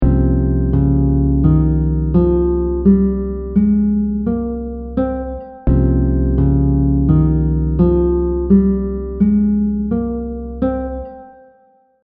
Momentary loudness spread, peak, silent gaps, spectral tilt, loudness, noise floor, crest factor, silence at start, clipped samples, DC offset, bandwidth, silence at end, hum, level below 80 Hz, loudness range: 10 LU; 0 dBFS; none; -12.5 dB/octave; -16 LUFS; -53 dBFS; 14 dB; 0 s; under 0.1%; under 0.1%; 2.4 kHz; 0.75 s; none; -22 dBFS; 3 LU